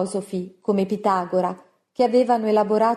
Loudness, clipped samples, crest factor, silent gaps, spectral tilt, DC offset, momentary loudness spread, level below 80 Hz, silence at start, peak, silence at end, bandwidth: -22 LUFS; under 0.1%; 14 dB; none; -6.5 dB/octave; under 0.1%; 11 LU; -68 dBFS; 0 s; -6 dBFS; 0 s; 12.5 kHz